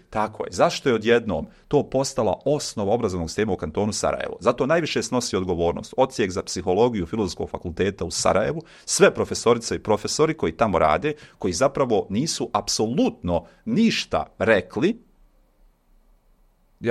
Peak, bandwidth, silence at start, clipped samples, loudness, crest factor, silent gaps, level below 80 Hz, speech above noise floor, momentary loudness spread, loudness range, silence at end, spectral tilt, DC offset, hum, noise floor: -2 dBFS; 14 kHz; 0.1 s; under 0.1%; -23 LUFS; 22 dB; none; -48 dBFS; 37 dB; 7 LU; 3 LU; 0 s; -4.5 dB/octave; under 0.1%; none; -59 dBFS